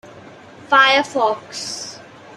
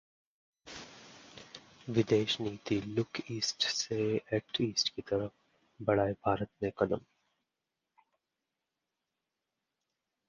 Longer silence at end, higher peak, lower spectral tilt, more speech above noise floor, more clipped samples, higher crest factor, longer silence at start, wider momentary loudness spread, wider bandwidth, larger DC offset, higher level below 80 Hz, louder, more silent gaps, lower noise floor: second, 0 s vs 3.3 s; first, -2 dBFS vs -14 dBFS; second, -1.5 dB/octave vs -4.5 dB/octave; second, 24 dB vs 55 dB; neither; about the same, 18 dB vs 22 dB; second, 0.05 s vs 0.65 s; second, 16 LU vs 20 LU; first, 13.5 kHz vs 10 kHz; neither; second, -70 dBFS vs -64 dBFS; first, -16 LUFS vs -33 LUFS; neither; second, -41 dBFS vs -88 dBFS